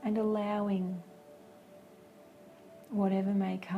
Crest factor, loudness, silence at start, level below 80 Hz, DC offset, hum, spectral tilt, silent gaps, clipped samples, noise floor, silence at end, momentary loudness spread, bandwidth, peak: 16 dB; -33 LUFS; 0 s; -76 dBFS; under 0.1%; none; -8.5 dB/octave; none; under 0.1%; -56 dBFS; 0 s; 24 LU; 10.5 kHz; -18 dBFS